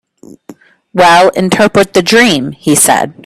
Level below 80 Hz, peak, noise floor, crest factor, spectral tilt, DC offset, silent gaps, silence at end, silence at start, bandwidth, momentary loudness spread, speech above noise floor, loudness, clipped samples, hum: -46 dBFS; 0 dBFS; -36 dBFS; 10 dB; -3 dB/octave; under 0.1%; none; 0.15 s; 0.3 s; over 20 kHz; 5 LU; 28 dB; -8 LUFS; 0.3%; none